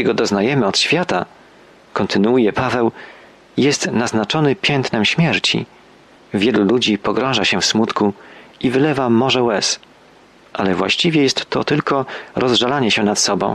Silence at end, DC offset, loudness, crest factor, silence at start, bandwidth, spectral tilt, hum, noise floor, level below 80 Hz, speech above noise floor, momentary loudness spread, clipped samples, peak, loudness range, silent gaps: 0 s; under 0.1%; -16 LUFS; 14 dB; 0 s; 12.5 kHz; -4 dB/octave; none; -47 dBFS; -54 dBFS; 31 dB; 8 LU; under 0.1%; -4 dBFS; 2 LU; none